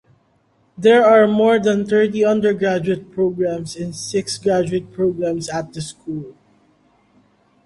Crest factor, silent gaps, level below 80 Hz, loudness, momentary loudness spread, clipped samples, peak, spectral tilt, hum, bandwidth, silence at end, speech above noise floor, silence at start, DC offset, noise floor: 16 dB; none; -56 dBFS; -17 LUFS; 16 LU; under 0.1%; -2 dBFS; -5.5 dB/octave; none; 11.5 kHz; 1.35 s; 43 dB; 0.8 s; under 0.1%; -60 dBFS